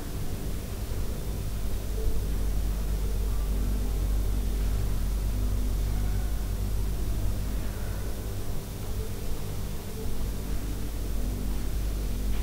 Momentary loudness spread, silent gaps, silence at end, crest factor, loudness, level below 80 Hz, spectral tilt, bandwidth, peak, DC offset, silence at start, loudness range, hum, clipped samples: 5 LU; none; 0 s; 12 dB; -33 LUFS; -30 dBFS; -6 dB/octave; 16 kHz; -16 dBFS; under 0.1%; 0 s; 4 LU; none; under 0.1%